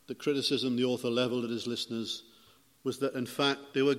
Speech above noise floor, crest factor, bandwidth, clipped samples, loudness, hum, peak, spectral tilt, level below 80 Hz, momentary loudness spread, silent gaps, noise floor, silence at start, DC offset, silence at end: 31 dB; 20 dB; 16 kHz; under 0.1%; -32 LUFS; none; -12 dBFS; -4.5 dB/octave; -76 dBFS; 8 LU; none; -62 dBFS; 0.1 s; under 0.1%; 0 s